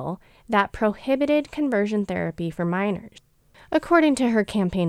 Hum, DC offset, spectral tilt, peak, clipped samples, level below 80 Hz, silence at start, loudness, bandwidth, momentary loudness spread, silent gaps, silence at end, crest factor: none; under 0.1%; -6.5 dB/octave; -4 dBFS; under 0.1%; -50 dBFS; 0 s; -23 LUFS; 14 kHz; 9 LU; none; 0 s; 20 dB